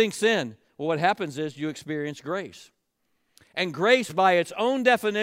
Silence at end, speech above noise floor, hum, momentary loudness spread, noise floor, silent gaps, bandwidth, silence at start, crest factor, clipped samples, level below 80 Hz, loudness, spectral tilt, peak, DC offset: 0 s; 50 dB; none; 12 LU; -74 dBFS; none; 16 kHz; 0 s; 18 dB; under 0.1%; -76 dBFS; -25 LUFS; -4.5 dB/octave; -6 dBFS; under 0.1%